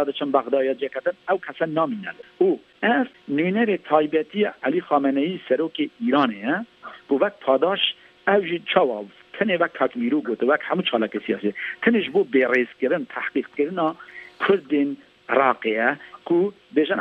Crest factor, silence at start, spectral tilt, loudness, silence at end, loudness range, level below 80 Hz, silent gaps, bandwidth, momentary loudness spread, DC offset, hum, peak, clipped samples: 20 dB; 0 s; -7.5 dB/octave; -22 LUFS; 0 s; 1 LU; -72 dBFS; none; 6 kHz; 6 LU; under 0.1%; none; -2 dBFS; under 0.1%